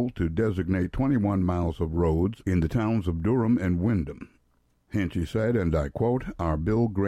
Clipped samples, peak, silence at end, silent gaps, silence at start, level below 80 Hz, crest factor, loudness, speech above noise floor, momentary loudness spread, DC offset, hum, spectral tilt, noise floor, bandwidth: under 0.1%; -12 dBFS; 0 s; none; 0 s; -40 dBFS; 14 dB; -26 LUFS; 42 dB; 5 LU; under 0.1%; none; -9 dB/octave; -67 dBFS; 12 kHz